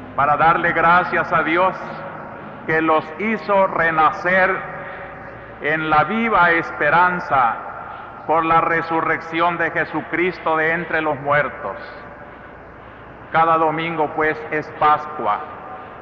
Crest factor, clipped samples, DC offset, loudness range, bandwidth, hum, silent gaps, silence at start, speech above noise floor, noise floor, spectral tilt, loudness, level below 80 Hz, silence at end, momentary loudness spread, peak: 14 dB; under 0.1%; under 0.1%; 4 LU; 7 kHz; none; none; 0 s; 21 dB; -39 dBFS; -7 dB/octave; -18 LUFS; -50 dBFS; 0 s; 18 LU; -6 dBFS